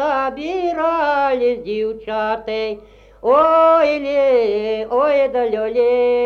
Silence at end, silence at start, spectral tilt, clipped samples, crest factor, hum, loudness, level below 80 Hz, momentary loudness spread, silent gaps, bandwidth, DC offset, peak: 0 s; 0 s; -5.5 dB/octave; under 0.1%; 14 dB; none; -17 LUFS; -50 dBFS; 10 LU; none; 6.8 kHz; under 0.1%; -2 dBFS